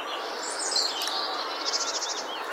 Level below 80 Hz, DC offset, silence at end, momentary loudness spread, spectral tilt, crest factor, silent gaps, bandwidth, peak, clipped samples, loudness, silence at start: -76 dBFS; under 0.1%; 0 s; 7 LU; 2 dB/octave; 18 dB; none; 17.5 kHz; -12 dBFS; under 0.1%; -28 LUFS; 0 s